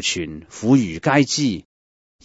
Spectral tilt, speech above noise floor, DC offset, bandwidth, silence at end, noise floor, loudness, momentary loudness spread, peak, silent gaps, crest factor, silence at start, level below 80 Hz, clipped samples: -4.5 dB/octave; over 71 dB; under 0.1%; 8 kHz; 0.65 s; under -90 dBFS; -19 LUFS; 12 LU; -4 dBFS; none; 18 dB; 0 s; -52 dBFS; under 0.1%